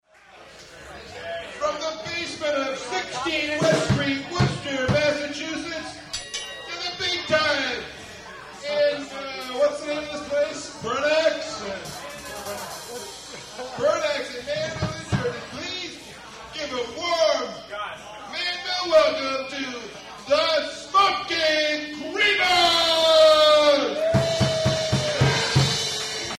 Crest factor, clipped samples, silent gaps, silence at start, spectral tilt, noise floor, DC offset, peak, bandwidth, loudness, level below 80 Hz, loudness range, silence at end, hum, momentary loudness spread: 18 dB; under 0.1%; none; 0.35 s; -4 dB/octave; -49 dBFS; under 0.1%; -6 dBFS; 15 kHz; -23 LUFS; -50 dBFS; 10 LU; 0 s; none; 17 LU